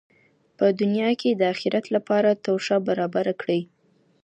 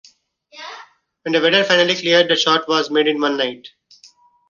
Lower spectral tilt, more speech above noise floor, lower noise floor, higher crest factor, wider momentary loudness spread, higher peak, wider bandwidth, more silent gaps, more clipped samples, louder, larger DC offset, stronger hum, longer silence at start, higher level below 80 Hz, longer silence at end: first, -6.5 dB/octave vs -3 dB/octave; about the same, 36 dB vs 36 dB; first, -58 dBFS vs -52 dBFS; about the same, 16 dB vs 18 dB; second, 5 LU vs 21 LU; second, -8 dBFS vs -2 dBFS; first, 8.8 kHz vs 7.4 kHz; neither; neither; second, -23 LUFS vs -16 LUFS; neither; neither; about the same, 0.6 s vs 0.55 s; second, -74 dBFS vs -66 dBFS; second, 0.6 s vs 0.8 s